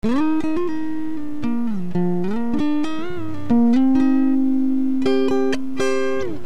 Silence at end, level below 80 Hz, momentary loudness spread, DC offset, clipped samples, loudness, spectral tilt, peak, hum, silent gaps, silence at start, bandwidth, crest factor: 0 s; -48 dBFS; 10 LU; 8%; under 0.1%; -21 LUFS; -7 dB/octave; -8 dBFS; 60 Hz at -45 dBFS; none; 0 s; 9.6 kHz; 12 dB